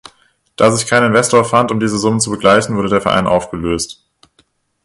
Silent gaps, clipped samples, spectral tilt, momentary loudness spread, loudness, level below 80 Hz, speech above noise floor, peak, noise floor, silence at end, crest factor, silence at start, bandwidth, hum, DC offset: none; under 0.1%; -4.5 dB/octave; 8 LU; -13 LUFS; -42 dBFS; 45 dB; 0 dBFS; -58 dBFS; 0.9 s; 14 dB; 0.6 s; 11.5 kHz; none; under 0.1%